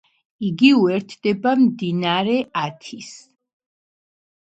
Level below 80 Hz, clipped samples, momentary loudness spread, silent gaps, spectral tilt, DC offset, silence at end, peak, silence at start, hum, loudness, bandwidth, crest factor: -66 dBFS; under 0.1%; 20 LU; none; -6 dB/octave; under 0.1%; 1.4 s; -2 dBFS; 0.4 s; none; -19 LUFS; 8.2 kHz; 20 dB